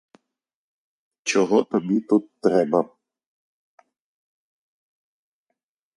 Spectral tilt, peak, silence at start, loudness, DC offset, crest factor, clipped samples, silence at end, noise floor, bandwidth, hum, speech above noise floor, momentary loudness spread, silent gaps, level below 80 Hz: -5 dB/octave; -4 dBFS; 1.25 s; -22 LUFS; under 0.1%; 22 dB; under 0.1%; 3.1 s; -83 dBFS; 11.5 kHz; none; 63 dB; 5 LU; none; -74 dBFS